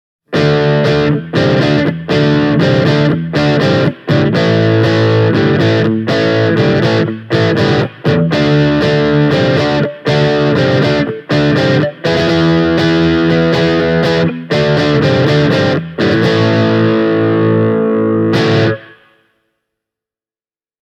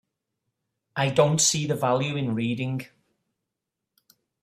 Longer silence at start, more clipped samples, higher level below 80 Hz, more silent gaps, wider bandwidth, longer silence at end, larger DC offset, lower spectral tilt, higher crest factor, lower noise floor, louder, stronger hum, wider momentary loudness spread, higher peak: second, 0.3 s vs 0.95 s; neither; first, -40 dBFS vs -64 dBFS; neither; second, 8.6 kHz vs 15 kHz; first, 1.95 s vs 1.55 s; neither; first, -7 dB/octave vs -4 dB/octave; second, 12 dB vs 22 dB; first, under -90 dBFS vs -85 dBFS; first, -12 LUFS vs -24 LUFS; neither; second, 3 LU vs 11 LU; first, 0 dBFS vs -6 dBFS